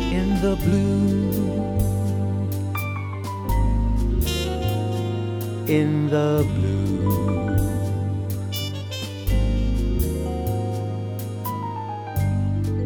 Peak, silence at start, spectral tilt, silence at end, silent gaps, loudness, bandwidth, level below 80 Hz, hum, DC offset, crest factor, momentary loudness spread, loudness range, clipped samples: -8 dBFS; 0 s; -7 dB/octave; 0 s; none; -24 LUFS; over 20 kHz; -30 dBFS; none; under 0.1%; 14 dB; 8 LU; 3 LU; under 0.1%